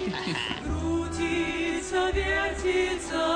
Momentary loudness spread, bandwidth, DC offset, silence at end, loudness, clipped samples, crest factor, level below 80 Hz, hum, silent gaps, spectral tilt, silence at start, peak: 4 LU; 10 kHz; under 0.1%; 0 s; -28 LUFS; under 0.1%; 14 dB; -40 dBFS; none; none; -4.5 dB/octave; 0 s; -14 dBFS